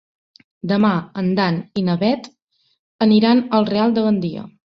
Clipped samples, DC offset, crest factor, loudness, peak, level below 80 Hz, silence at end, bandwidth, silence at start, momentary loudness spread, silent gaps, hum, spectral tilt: under 0.1%; under 0.1%; 16 dB; -18 LUFS; -2 dBFS; -58 dBFS; 0.3 s; 6.2 kHz; 0.65 s; 9 LU; 2.42-2.48 s, 2.79-2.99 s; none; -8 dB/octave